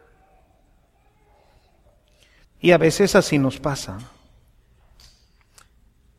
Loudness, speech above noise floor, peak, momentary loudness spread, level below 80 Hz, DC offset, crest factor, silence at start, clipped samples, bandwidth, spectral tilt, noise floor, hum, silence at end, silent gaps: -19 LUFS; 41 dB; 0 dBFS; 16 LU; -50 dBFS; under 0.1%; 24 dB; 2.65 s; under 0.1%; 15 kHz; -5 dB/octave; -59 dBFS; none; 2.1 s; none